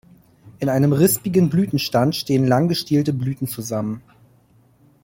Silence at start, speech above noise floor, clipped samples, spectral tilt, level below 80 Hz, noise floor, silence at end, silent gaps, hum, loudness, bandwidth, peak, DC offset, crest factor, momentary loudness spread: 0.45 s; 37 dB; under 0.1%; -6 dB/octave; -56 dBFS; -55 dBFS; 1.05 s; none; none; -19 LUFS; 16.5 kHz; -4 dBFS; under 0.1%; 16 dB; 10 LU